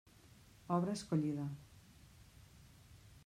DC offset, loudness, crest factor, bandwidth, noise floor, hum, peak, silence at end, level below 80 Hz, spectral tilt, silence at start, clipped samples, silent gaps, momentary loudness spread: under 0.1%; -39 LUFS; 20 dB; 15 kHz; -63 dBFS; none; -22 dBFS; 0.1 s; -68 dBFS; -7 dB/octave; 0.25 s; under 0.1%; none; 25 LU